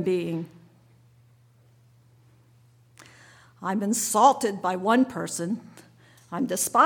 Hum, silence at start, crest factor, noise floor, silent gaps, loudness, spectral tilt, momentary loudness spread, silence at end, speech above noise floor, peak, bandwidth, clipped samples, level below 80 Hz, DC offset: none; 0 s; 22 dB; -58 dBFS; none; -25 LUFS; -4 dB/octave; 15 LU; 0 s; 34 dB; -6 dBFS; 19 kHz; under 0.1%; -72 dBFS; under 0.1%